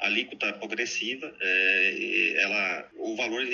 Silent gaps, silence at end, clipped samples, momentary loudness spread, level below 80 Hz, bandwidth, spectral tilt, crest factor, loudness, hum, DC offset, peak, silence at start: none; 0 s; under 0.1%; 9 LU; -76 dBFS; 7.4 kHz; 0.5 dB/octave; 18 dB; -26 LUFS; none; under 0.1%; -10 dBFS; 0 s